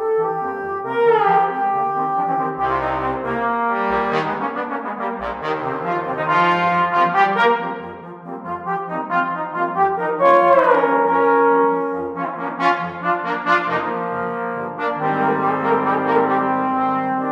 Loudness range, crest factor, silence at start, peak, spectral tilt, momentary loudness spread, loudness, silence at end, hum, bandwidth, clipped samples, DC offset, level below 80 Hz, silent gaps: 5 LU; 18 dB; 0 s; -2 dBFS; -7 dB/octave; 10 LU; -19 LUFS; 0 s; none; 7.8 kHz; under 0.1%; under 0.1%; -52 dBFS; none